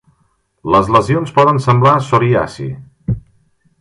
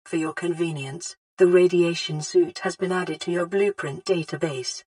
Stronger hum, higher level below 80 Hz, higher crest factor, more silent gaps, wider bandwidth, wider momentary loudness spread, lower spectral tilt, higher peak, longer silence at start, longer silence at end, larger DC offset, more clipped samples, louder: neither; first, -40 dBFS vs -74 dBFS; about the same, 14 dB vs 18 dB; second, none vs 1.17-1.37 s; about the same, 11.5 kHz vs 11 kHz; first, 15 LU vs 12 LU; first, -7.5 dB/octave vs -5 dB/octave; first, 0 dBFS vs -6 dBFS; first, 0.65 s vs 0.05 s; first, 0.6 s vs 0.05 s; neither; neither; first, -13 LUFS vs -23 LUFS